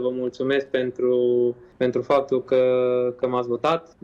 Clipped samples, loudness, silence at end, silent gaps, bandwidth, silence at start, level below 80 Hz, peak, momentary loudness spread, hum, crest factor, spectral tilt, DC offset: under 0.1%; -22 LUFS; 0.2 s; none; 7.2 kHz; 0 s; -62 dBFS; -10 dBFS; 6 LU; none; 12 dB; -7 dB/octave; under 0.1%